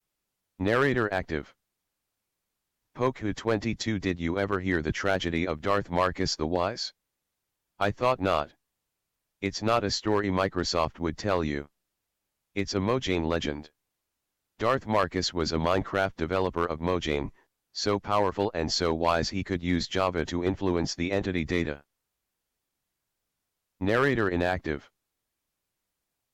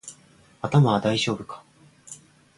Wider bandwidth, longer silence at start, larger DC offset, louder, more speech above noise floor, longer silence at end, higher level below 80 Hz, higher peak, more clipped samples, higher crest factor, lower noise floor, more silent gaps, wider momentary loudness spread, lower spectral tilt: first, 15 kHz vs 11.5 kHz; first, 0.6 s vs 0.05 s; neither; second, -28 LUFS vs -23 LUFS; first, 56 dB vs 33 dB; first, 1.55 s vs 0.45 s; first, -48 dBFS vs -60 dBFS; second, -14 dBFS vs -6 dBFS; neither; second, 14 dB vs 20 dB; first, -83 dBFS vs -55 dBFS; neither; second, 8 LU vs 24 LU; about the same, -5 dB/octave vs -6 dB/octave